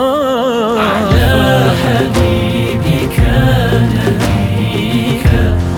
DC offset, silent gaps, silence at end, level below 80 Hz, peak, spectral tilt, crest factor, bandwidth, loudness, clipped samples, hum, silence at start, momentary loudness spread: under 0.1%; none; 0 s; -22 dBFS; 0 dBFS; -6.5 dB/octave; 10 dB; 18.5 kHz; -12 LUFS; under 0.1%; none; 0 s; 4 LU